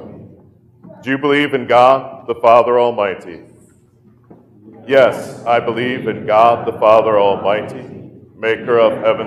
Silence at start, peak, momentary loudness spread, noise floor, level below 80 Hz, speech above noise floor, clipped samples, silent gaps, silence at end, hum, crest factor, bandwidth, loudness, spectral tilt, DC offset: 0 s; 0 dBFS; 14 LU; -49 dBFS; -60 dBFS; 36 dB; under 0.1%; none; 0 s; none; 16 dB; 12.5 kHz; -14 LUFS; -6 dB/octave; under 0.1%